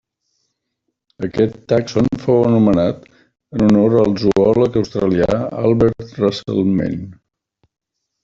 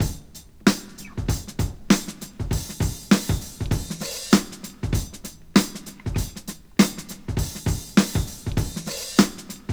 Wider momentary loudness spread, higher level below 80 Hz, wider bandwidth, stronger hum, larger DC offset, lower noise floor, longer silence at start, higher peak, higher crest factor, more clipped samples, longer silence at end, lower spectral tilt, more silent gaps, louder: second, 11 LU vs 14 LU; second, -44 dBFS vs -36 dBFS; second, 7.6 kHz vs over 20 kHz; neither; second, under 0.1% vs 0.1%; first, -78 dBFS vs -44 dBFS; first, 1.2 s vs 0 s; about the same, -2 dBFS vs 0 dBFS; second, 14 dB vs 24 dB; neither; first, 1.1 s vs 0 s; first, -8 dB/octave vs -4.5 dB/octave; neither; first, -16 LUFS vs -24 LUFS